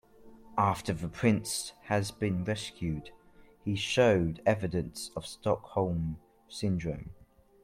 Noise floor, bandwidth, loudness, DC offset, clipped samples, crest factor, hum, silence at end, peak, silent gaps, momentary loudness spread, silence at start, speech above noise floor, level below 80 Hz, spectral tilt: -54 dBFS; 16 kHz; -31 LUFS; under 0.1%; under 0.1%; 20 dB; none; 0.5 s; -12 dBFS; none; 13 LU; 0.25 s; 23 dB; -54 dBFS; -5.5 dB/octave